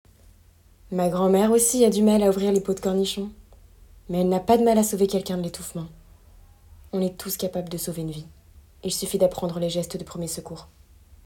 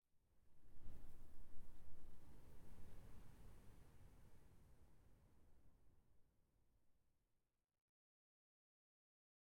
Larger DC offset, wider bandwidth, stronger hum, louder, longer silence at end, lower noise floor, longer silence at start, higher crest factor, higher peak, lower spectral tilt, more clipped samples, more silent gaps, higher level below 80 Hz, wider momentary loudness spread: neither; first, 18 kHz vs 13 kHz; neither; first, -23 LUFS vs -68 LUFS; second, 0.6 s vs 2.6 s; second, -54 dBFS vs -87 dBFS; first, 0.9 s vs 0.15 s; about the same, 18 dB vs 16 dB; first, -6 dBFS vs -36 dBFS; about the same, -5 dB/octave vs -6 dB/octave; neither; neither; first, -50 dBFS vs -66 dBFS; first, 16 LU vs 3 LU